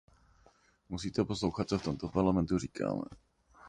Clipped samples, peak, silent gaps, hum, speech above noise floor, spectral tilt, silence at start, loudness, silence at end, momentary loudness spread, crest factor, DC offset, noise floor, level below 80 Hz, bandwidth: under 0.1%; -16 dBFS; none; none; 33 dB; -6.5 dB/octave; 0.9 s; -34 LUFS; 0 s; 10 LU; 20 dB; under 0.1%; -66 dBFS; -52 dBFS; 10.5 kHz